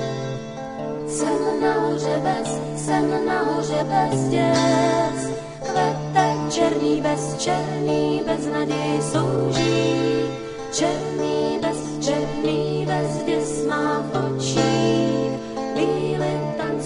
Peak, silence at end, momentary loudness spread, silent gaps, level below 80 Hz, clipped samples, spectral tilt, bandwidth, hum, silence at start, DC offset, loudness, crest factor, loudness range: -4 dBFS; 0 s; 7 LU; none; -50 dBFS; under 0.1%; -5.5 dB/octave; 11 kHz; none; 0 s; under 0.1%; -22 LUFS; 18 dB; 2 LU